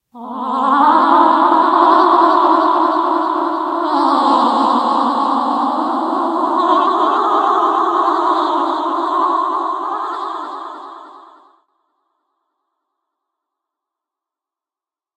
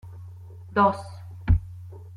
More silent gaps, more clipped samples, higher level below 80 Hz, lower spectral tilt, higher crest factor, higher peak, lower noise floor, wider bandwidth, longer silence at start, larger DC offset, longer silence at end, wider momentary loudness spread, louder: neither; neither; second, -74 dBFS vs -34 dBFS; second, -4.5 dB/octave vs -8.5 dB/octave; about the same, 16 dB vs 20 dB; first, 0 dBFS vs -8 dBFS; first, -90 dBFS vs -42 dBFS; second, 9.2 kHz vs 10.5 kHz; about the same, 0.15 s vs 0.05 s; neither; first, 4 s vs 0 s; second, 11 LU vs 21 LU; first, -14 LUFS vs -25 LUFS